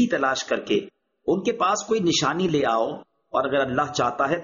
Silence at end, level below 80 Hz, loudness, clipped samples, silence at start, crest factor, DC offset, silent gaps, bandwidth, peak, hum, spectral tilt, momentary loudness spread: 0 s; -58 dBFS; -23 LUFS; under 0.1%; 0 s; 14 dB; under 0.1%; none; 7.4 kHz; -8 dBFS; none; -3.5 dB/octave; 5 LU